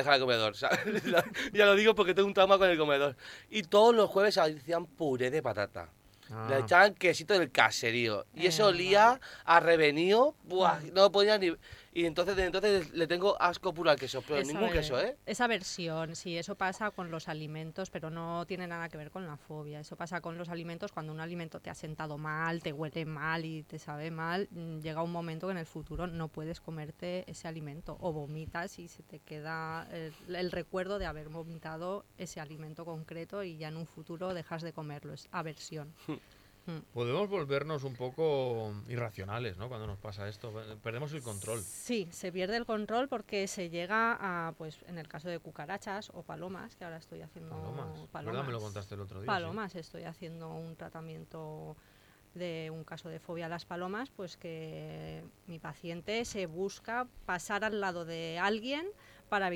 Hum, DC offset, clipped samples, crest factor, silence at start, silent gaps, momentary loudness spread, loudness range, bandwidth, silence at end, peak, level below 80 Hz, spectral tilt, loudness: none; under 0.1%; under 0.1%; 26 dB; 0 s; none; 19 LU; 16 LU; 17 kHz; 0 s; -8 dBFS; -60 dBFS; -4.5 dB/octave; -32 LUFS